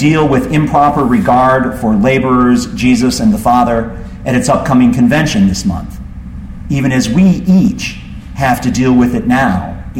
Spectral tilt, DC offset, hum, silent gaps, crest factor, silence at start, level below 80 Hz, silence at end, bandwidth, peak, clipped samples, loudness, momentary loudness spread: -6 dB/octave; under 0.1%; none; none; 10 dB; 0 s; -28 dBFS; 0 s; 16 kHz; 0 dBFS; under 0.1%; -11 LUFS; 13 LU